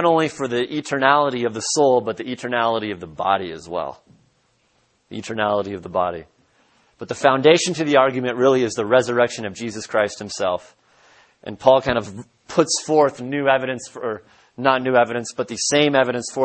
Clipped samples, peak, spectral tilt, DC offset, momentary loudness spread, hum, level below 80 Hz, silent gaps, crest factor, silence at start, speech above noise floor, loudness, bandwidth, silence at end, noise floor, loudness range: under 0.1%; 0 dBFS; -4 dB/octave; under 0.1%; 13 LU; none; -58 dBFS; none; 20 dB; 0 s; 44 dB; -20 LUFS; 8.8 kHz; 0 s; -64 dBFS; 7 LU